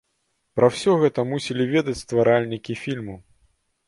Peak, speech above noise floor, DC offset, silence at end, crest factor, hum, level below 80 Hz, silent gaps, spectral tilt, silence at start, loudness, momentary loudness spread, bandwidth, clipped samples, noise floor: -2 dBFS; 51 dB; under 0.1%; 0.7 s; 20 dB; none; -56 dBFS; none; -6 dB/octave; 0.55 s; -22 LUFS; 11 LU; 11.5 kHz; under 0.1%; -72 dBFS